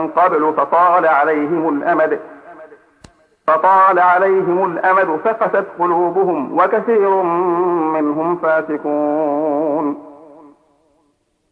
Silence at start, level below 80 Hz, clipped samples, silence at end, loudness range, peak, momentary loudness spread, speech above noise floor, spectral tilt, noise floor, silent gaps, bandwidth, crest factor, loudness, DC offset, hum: 0 s; -66 dBFS; under 0.1%; 1.35 s; 4 LU; -2 dBFS; 6 LU; 48 dB; -8.5 dB/octave; -63 dBFS; none; 5 kHz; 14 dB; -15 LUFS; under 0.1%; none